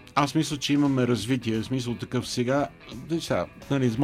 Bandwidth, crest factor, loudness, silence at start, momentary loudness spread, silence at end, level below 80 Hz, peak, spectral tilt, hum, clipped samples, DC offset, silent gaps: 15.5 kHz; 20 dB; -26 LUFS; 0 s; 7 LU; 0 s; -54 dBFS; -6 dBFS; -5.5 dB/octave; none; under 0.1%; under 0.1%; none